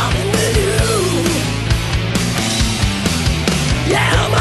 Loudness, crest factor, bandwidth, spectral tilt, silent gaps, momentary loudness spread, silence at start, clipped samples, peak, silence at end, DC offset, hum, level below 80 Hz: -16 LUFS; 14 dB; 12.5 kHz; -4.5 dB/octave; none; 4 LU; 0 s; under 0.1%; -2 dBFS; 0 s; under 0.1%; none; -24 dBFS